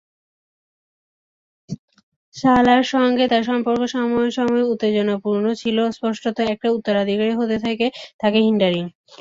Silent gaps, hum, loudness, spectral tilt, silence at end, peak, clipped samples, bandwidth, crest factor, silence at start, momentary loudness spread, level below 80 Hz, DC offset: 1.79-1.88 s, 2.03-2.32 s, 8.14-8.19 s; none; -19 LUFS; -6 dB/octave; 0.3 s; -4 dBFS; under 0.1%; 7.6 kHz; 16 dB; 1.7 s; 8 LU; -56 dBFS; under 0.1%